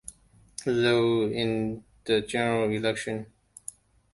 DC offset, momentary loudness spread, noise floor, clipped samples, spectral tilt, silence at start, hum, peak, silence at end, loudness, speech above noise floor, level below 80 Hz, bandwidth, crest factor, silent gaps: under 0.1%; 19 LU; -49 dBFS; under 0.1%; -5 dB/octave; 0.1 s; none; -10 dBFS; 0.9 s; -27 LUFS; 23 dB; -58 dBFS; 11.5 kHz; 18 dB; none